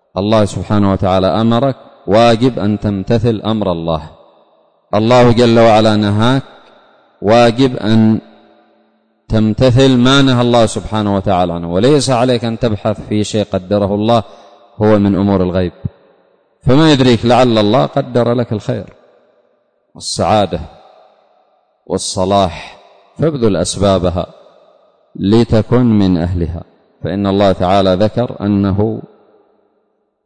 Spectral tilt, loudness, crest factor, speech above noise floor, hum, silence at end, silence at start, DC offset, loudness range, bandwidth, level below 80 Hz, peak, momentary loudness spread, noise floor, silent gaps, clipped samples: -6.5 dB/octave; -13 LUFS; 12 dB; 51 dB; none; 1.25 s; 0.15 s; under 0.1%; 6 LU; 9.6 kHz; -36 dBFS; -2 dBFS; 11 LU; -62 dBFS; none; under 0.1%